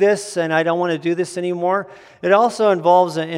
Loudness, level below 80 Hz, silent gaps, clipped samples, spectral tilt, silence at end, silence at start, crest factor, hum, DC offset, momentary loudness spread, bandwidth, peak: -18 LUFS; -74 dBFS; none; under 0.1%; -5 dB/octave; 0 s; 0 s; 16 dB; none; under 0.1%; 8 LU; 13 kHz; -2 dBFS